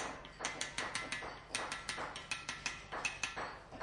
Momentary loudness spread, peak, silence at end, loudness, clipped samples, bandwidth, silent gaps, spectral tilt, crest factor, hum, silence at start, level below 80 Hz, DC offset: 4 LU; -20 dBFS; 0 s; -41 LUFS; under 0.1%; 11.5 kHz; none; -1.5 dB/octave; 22 dB; none; 0 s; -62 dBFS; under 0.1%